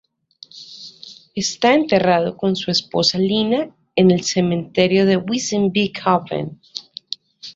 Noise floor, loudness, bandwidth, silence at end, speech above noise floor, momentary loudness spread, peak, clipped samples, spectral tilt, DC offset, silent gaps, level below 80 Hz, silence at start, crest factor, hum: -47 dBFS; -18 LUFS; 7.8 kHz; 0.05 s; 29 dB; 18 LU; -2 dBFS; under 0.1%; -5 dB/octave; under 0.1%; none; -58 dBFS; 0.55 s; 18 dB; none